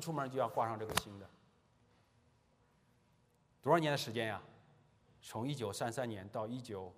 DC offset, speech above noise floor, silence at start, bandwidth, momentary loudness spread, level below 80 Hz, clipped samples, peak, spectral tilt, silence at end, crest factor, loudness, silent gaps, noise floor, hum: under 0.1%; 34 dB; 0 s; 15.5 kHz; 15 LU; -72 dBFS; under 0.1%; -12 dBFS; -4.5 dB/octave; 0.05 s; 28 dB; -38 LUFS; none; -73 dBFS; none